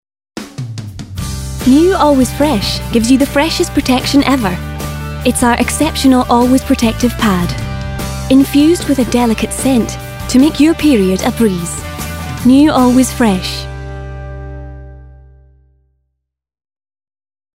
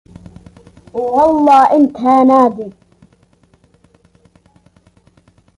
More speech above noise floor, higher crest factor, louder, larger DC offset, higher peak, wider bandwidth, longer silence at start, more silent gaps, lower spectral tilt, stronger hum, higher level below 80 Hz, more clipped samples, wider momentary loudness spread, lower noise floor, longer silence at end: first, 61 dB vs 42 dB; about the same, 12 dB vs 14 dB; about the same, -12 LUFS vs -11 LUFS; neither; about the same, 0 dBFS vs 0 dBFS; first, 16.5 kHz vs 11.5 kHz; second, 0.35 s vs 0.95 s; neither; second, -5 dB/octave vs -6.5 dB/octave; neither; first, -28 dBFS vs -50 dBFS; neither; about the same, 17 LU vs 18 LU; first, -71 dBFS vs -53 dBFS; second, 2.5 s vs 2.85 s